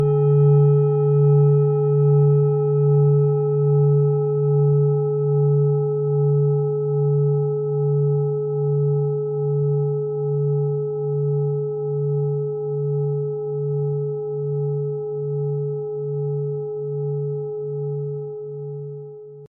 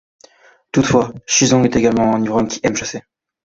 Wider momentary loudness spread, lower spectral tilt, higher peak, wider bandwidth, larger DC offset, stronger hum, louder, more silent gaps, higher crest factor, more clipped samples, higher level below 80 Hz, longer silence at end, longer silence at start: about the same, 10 LU vs 9 LU; first, -14 dB/octave vs -4.5 dB/octave; second, -8 dBFS vs -2 dBFS; second, 1.4 kHz vs 8 kHz; neither; neither; second, -20 LUFS vs -16 LUFS; neither; about the same, 12 dB vs 16 dB; neither; second, -64 dBFS vs -44 dBFS; second, 0.05 s vs 0.5 s; second, 0 s vs 0.75 s